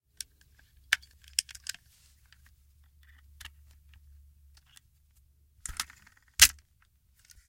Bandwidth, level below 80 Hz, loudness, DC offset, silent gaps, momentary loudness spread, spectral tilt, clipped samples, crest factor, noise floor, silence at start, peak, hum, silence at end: 16.5 kHz; -54 dBFS; -27 LUFS; under 0.1%; none; 29 LU; 2.5 dB/octave; under 0.1%; 32 dB; -67 dBFS; 0.9 s; -2 dBFS; none; 1 s